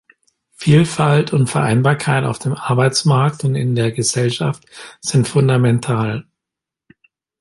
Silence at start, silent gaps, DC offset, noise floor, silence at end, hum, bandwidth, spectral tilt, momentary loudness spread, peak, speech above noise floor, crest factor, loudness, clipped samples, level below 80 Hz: 0.6 s; none; under 0.1%; -85 dBFS; 1.2 s; none; 11.5 kHz; -5.5 dB/octave; 9 LU; -2 dBFS; 69 dB; 16 dB; -16 LUFS; under 0.1%; -50 dBFS